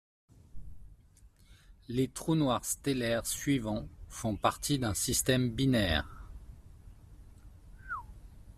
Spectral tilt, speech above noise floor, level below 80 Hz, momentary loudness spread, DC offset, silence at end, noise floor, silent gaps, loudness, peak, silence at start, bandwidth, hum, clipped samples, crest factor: -4.5 dB/octave; 29 dB; -50 dBFS; 18 LU; under 0.1%; 0.05 s; -60 dBFS; none; -32 LUFS; -12 dBFS; 0.55 s; 15.5 kHz; none; under 0.1%; 22 dB